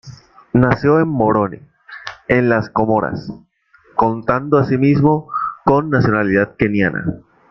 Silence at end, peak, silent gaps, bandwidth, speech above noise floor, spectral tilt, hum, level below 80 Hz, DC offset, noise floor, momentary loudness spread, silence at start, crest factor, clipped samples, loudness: 0.3 s; 0 dBFS; none; 6.6 kHz; 37 dB; -9 dB/octave; none; -44 dBFS; under 0.1%; -52 dBFS; 11 LU; 0.05 s; 16 dB; under 0.1%; -16 LUFS